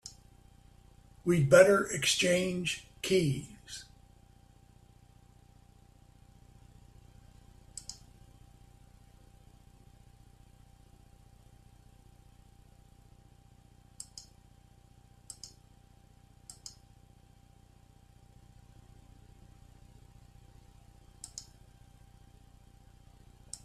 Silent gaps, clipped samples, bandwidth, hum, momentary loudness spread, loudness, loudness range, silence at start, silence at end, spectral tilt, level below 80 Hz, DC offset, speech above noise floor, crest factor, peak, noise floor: none; under 0.1%; 14 kHz; 60 Hz at -65 dBFS; 28 LU; -29 LUFS; 27 LU; 0.05 s; 0.1 s; -4 dB/octave; -60 dBFS; under 0.1%; 33 dB; 30 dB; -8 dBFS; -60 dBFS